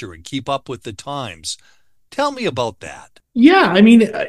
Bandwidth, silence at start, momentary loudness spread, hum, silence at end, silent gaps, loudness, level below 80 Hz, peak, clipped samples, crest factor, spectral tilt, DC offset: 12 kHz; 0 s; 20 LU; none; 0 s; none; -15 LUFS; -52 dBFS; 0 dBFS; under 0.1%; 16 dB; -5 dB/octave; 0.2%